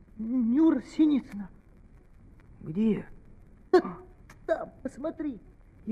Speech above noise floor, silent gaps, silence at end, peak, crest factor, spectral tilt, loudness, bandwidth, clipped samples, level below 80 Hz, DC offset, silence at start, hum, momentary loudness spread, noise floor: 26 dB; none; 0 s; -10 dBFS; 20 dB; -8 dB/octave; -28 LUFS; 8.8 kHz; under 0.1%; -54 dBFS; under 0.1%; 0.15 s; none; 21 LU; -54 dBFS